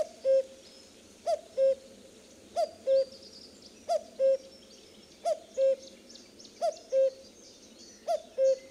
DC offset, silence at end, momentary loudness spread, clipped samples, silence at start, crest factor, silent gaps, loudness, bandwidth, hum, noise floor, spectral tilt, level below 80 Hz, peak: under 0.1%; 0.1 s; 23 LU; under 0.1%; 0 s; 14 dB; none; -31 LUFS; 11 kHz; none; -54 dBFS; -2.5 dB/octave; -74 dBFS; -18 dBFS